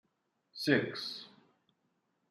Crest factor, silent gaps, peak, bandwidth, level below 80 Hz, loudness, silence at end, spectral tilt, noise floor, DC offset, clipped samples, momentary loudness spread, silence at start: 24 dB; none; -14 dBFS; 14.5 kHz; -82 dBFS; -34 LUFS; 1.05 s; -5 dB/octave; -79 dBFS; under 0.1%; under 0.1%; 17 LU; 0.55 s